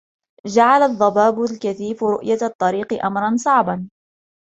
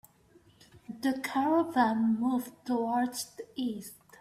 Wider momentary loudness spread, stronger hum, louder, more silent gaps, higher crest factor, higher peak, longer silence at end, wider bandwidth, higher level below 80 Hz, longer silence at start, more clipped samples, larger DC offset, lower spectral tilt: second, 10 LU vs 13 LU; neither; first, -18 LUFS vs -30 LUFS; first, 2.55-2.59 s vs none; about the same, 18 dB vs 20 dB; first, -2 dBFS vs -12 dBFS; first, 0.7 s vs 0.25 s; second, 8.2 kHz vs 15.5 kHz; first, -62 dBFS vs -72 dBFS; second, 0.45 s vs 0.75 s; neither; neither; about the same, -5.5 dB/octave vs -4.5 dB/octave